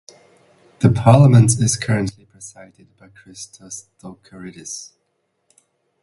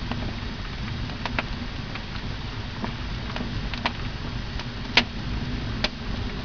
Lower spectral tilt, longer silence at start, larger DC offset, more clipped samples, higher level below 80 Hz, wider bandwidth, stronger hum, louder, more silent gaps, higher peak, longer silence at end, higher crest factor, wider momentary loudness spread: about the same, -6 dB/octave vs -5 dB/octave; first, 0.8 s vs 0 s; second, under 0.1% vs 0.6%; neither; second, -48 dBFS vs -36 dBFS; first, 11.5 kHz vs 5.4 kHz; neither; first, -14 LUFS vs -29 LUFS; neither; first, 0 dBFS vs -4 dBFS; first, 1.2 s vs 0 s; second, 20 dB vs 26 dB; first, 26 LU vs 11 LU